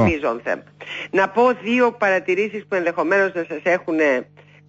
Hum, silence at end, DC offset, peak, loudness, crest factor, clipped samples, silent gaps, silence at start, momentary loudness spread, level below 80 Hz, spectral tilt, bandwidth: none; 0.45 s; under 0.1%; -6 dBFS; -20 LUFS; 14 dB; under 0.1%; none; 0 s; 8 LU; -50 dBFS; -6 dB/octave; 7.8 kHz